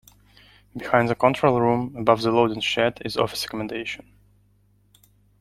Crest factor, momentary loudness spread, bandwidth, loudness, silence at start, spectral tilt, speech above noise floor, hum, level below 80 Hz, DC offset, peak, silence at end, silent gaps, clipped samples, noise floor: 22 dB; 13 LU; 15.5 kHz; -22 LUFS; 0.75 s; -5.5 dB/octave; 39 dB; 50 Hz at -45 dBFS; -54 dBFS; under 0.1%; -2 dBFS; 1.45 s; none; under 0.1%; -61 dBFS